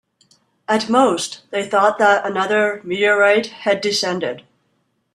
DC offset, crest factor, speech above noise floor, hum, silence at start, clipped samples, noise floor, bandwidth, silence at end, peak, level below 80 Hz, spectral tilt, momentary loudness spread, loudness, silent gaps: under 0.1%; 16 dB; 50 dB; none; 0.7 s; under 0.1%; -67 dBFS; 13 kHz; 0.75 s; -2 dBFS; -66 dBFS; -3.5 dB/octave; 10 LU; -17 LUFS; none